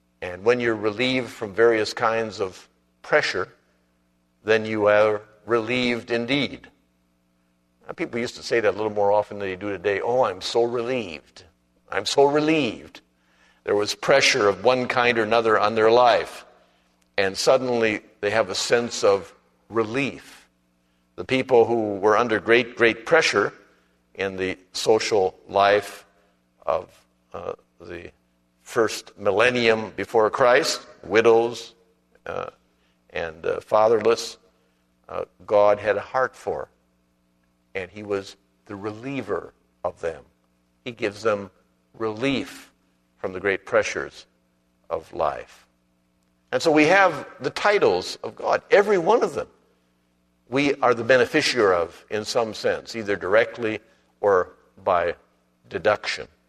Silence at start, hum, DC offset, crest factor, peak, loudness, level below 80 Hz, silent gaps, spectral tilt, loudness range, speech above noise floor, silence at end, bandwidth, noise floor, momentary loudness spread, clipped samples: 0.2 s; 60 Hz at -60 dBFS; under 0.1%; 22 dB; -2 dBFS; -22 LUFS; -60 dBFS; none; -4 dB/octave; 9 LU; 44 dB; 0.25 s; 13.5 kHz; -66 dBFS; 16 LU; under 0.1%